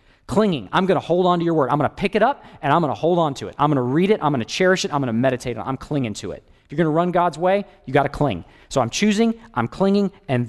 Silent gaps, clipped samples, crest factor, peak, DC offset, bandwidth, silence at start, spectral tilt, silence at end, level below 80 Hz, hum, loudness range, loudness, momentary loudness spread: none; under 0.1%; 16 dB; -4 dBFS; under 0.1%; 12 kHz; 0.3 s; -6 dB/octave; 0 s; -48 dBFS; none; 2 LU; -20 LUFS; 8 LU